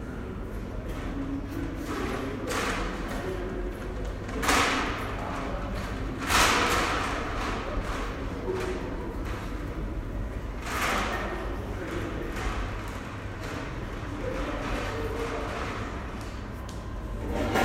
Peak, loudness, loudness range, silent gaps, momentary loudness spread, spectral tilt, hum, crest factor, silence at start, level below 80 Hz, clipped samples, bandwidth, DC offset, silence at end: -10 dBFS; -31 LUFS; 7 LU; none; 12 LU; -4 dB/octave; none; 22 dB; 0 s; -36 dBFS; under 0.1%; 16 kHz; under 0.1%; 0 s